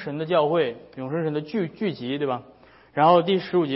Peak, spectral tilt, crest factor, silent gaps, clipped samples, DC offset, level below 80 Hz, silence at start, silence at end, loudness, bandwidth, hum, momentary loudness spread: -4 dBFS; -10.5 dB/octave; 18 dB; none; under 0.1%; under 0.1%; -66 dBFS; 0 s; 0 s; -24 LUFS; 5.8 kHz; none; 12 LU